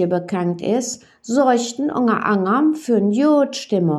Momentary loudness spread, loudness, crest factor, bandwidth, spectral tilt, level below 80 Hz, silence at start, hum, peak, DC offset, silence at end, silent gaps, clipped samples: 6 LU; -18 LUFS; 14 dB; 12.5 kHz; -5.5 dB/octave; -70 dBFS; 0 s; none; -4 dBFS; under 0.1%; 0 s; none; under 0.1%